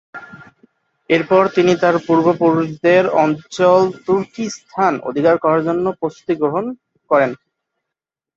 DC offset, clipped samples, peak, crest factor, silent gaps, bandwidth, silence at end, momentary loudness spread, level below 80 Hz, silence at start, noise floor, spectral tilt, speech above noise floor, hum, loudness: under 0.1%; under 0.1%; -2 dBFS; 16 dB; none; 7.8 kHz; 1 s; 12 LU; -60 dBFS; 0.15 s; -84 dBFS; -6.5 dB/octave; 69 dB; none; -16 LUFS